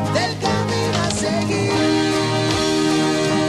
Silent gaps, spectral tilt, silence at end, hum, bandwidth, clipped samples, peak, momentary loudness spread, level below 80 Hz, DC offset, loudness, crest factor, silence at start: none; -4.5 dB/octave; 0 s; none; 13 kHz; under 0.1%; -6 dBFS; 3 LU; -44 dBFS; under 0.1%; -19 LUFS; 12 dB; 0 s